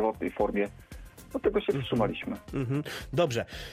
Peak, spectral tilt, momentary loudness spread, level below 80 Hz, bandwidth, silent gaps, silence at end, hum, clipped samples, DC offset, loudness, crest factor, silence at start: -14 dBFS; -6.5 dB/octave; 10 LU; -50 dBFS; 15.5 kHz; none; 0 s; none; under 0.1%; under 0.1%; -31 LUFS; 16 dB; 0 s